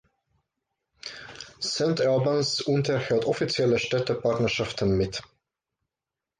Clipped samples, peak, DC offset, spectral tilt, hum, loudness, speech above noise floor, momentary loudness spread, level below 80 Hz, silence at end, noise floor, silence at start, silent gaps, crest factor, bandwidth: under 0.1%; -12 dBFS; under 0.1%; -5 dB/octave; none; -25 LUFS; 64 dB; 16 LU; -52 dBFS; 1.15 s; -89 dBFS; 1.05 s; none; 14 dB; 9.8 kHz